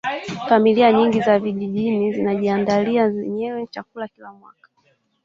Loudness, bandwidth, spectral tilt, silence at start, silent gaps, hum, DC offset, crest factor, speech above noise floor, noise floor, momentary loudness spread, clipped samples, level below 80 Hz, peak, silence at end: -19 LUFS; 7.4 kHz; -7 dB/octave; 0.05 s; none; none; under 0.1%; 18 dB; 44 dB; -63 dBFS; 17 LU; under 0.1%; -62 dBFS; -2 dBFS; 0.9 s